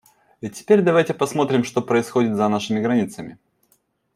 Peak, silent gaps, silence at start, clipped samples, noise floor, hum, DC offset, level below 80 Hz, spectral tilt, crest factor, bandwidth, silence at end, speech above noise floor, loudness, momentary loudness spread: -2 dBFS; none; 0.45 s; under 0.1%; -65 dBFS; none; under 0.1%; -64 dBFS; -6 dB/octave; 18 dB; 15 kHz; 0.8 s; 45 dB; -20 LUFS; 17 LU